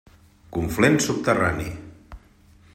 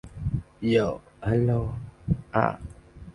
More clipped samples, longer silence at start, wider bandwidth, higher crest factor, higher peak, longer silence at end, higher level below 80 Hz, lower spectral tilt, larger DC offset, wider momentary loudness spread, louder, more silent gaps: neither; first, 0.5 s vs 0.05 s; first, 16 kHz vs 10.5 kHz; about the same, 20 dB vs 22 dB; about the same, -4 dBFS vs -4 dBFS; first, 0.55 s vs 0.05 s; about the same, -46 dBFS vs -42 dBFS; second, -5 dB/octave vs -8.5 dB/octave; neither; about the same, 15 LU vs 14 LU; first, -22 LUFS vs -27 LUFS; neither